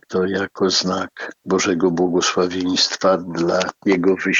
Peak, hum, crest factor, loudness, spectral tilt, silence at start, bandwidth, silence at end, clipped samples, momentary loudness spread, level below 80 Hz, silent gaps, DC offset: -4 dBFS; none; 16 dB; -19 LUFS; -4 dB/octave; 0.1 s; 7.8 kHz; 0 s; under 0.1%; 5 LU; -64 dBFS; none; under 0.1%